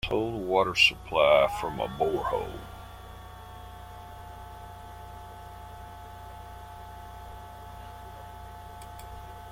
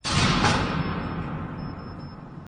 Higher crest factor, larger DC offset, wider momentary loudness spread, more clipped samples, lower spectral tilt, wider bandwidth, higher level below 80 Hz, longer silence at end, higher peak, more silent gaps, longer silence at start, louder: first, 24 dB vs 18 dB; neither; first, 23 LU vs 18 LU; neither; about the same, -4 dB/octave vs -4.5 dB/octave; first, 16.5 kHz vs 10 kHz; second, -48 dBFS vs -40 dBFS; about the same, 0 s vs 0 s; about the same, -8 dBFS vs -10 dBFS; neither; about the same, 0.05 s vs 0.05 s; about the same, -25 LUFS vs -25 LUFS